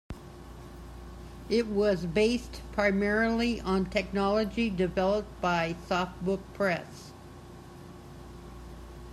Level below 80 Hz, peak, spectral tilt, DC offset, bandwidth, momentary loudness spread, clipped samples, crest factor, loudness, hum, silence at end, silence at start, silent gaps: -48 dBFS; -12 dBFS; -6 dB/octave; under 0.1%; 14 kHz; 21 LU; under 0.1%; 18 dB; -29 LUFS; none; 0 s; 0.1 s; none